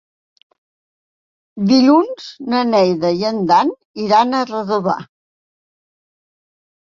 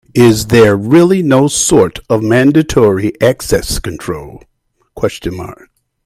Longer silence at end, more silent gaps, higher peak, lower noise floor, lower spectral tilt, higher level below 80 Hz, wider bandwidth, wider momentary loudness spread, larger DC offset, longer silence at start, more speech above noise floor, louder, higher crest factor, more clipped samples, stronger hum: first, 1.8 s vs 0.5 s; first, 3.85-3.94 s vs none; about the same, -2 dBFS vs 0 dBFS; first, under -90 dBFS vs -39 dBFS; about the same, -6 dB/octave vs -5.5 dB/octave; second, -62 dBFS vs -34 dBFS; second, 7.4 kHz vs 16 kHz; second, 11 LU vs 14 LU; neither; first, 1.55 s vs 0.15 s; first, over 75 dB vs 28 dB; second, -16 LUFS vs -11 LUFS; about the same, 16 dB vs 12 dB; second, under 0.1% vs 0.1%; neither